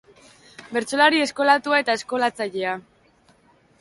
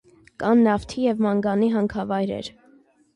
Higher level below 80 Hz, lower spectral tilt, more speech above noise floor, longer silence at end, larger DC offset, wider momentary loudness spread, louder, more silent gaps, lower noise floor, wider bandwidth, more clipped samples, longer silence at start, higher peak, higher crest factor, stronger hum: second, -68 dBFS vs -52 dBFS; second, -2.5 dB/octave vs -7 dB/octave; about the same, 37 dB vs 35 dB; first, 1 s vs 0.65 s; neither; about the same, 11 LU vs 10 LU; about the same, -21 LUFS vs -22 LUFS; neither; about the same, -58 dBFS vs -56 dBFS; about the same, 11.5 kHz vs 10.5 kHz; neither; first, 0.6 s vs 0.4 s; first, -4 dBFS vs -10 dBFS; first, 20 dB vs 14 dB; neither